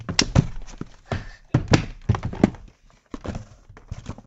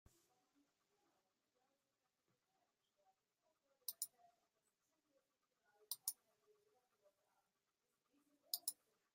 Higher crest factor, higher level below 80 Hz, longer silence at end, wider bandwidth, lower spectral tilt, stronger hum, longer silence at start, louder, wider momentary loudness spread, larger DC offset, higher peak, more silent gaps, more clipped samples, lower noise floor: second, 24 dB vs 34 dB; first, -36 dBFS vs under -90 dBFS; second, 0.05 s vs 0.4 s; second, 8.2 kHz vs 15.5 kHz; first, -5 dB/octave vs 1.5 dB/octave; neither; second, 0 s vs 3.9 s; first, -24 LUFS vs -49 LUFS; first, 20 LU vs 10 LU; neither; first, 0 dBFS vs -24 dBFS; neither; neither; second, -51 dBFS vs under -90 dBFS